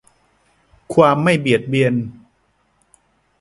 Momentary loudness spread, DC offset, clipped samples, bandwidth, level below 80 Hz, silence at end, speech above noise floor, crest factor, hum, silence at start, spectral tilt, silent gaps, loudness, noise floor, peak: 9 LU; under 0.1%; under 0.1%; 11.5 kHz; -56 dBFS; 1.3 s; 47 dB; 20 dB; none; 0.9 s; -6.5 dB/octave; none; -16 LUFS; -62 dBFS; 0 dBFS